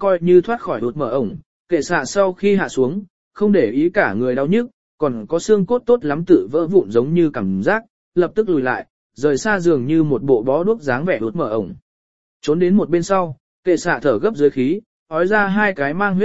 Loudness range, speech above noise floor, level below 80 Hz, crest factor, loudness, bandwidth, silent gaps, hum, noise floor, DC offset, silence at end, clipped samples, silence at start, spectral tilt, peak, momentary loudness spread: 2 LU; over 73 dB; -52 dBFS; 16 dB; -18 LUFS; 8 kHz; 1.46-1.65 s, 3.10-3.31 s, 4.73-4.98 s, 7.90-8.12 s, 8.90-9.10 s, 11.82-12.40 s, 13.40-13.63 s, 14.86-15.06 s; none; under -90 dBFS; 1%; 0 s; under 0.1%; 0 s; -6.5 dB/octave; 0 dBFS; 7 LU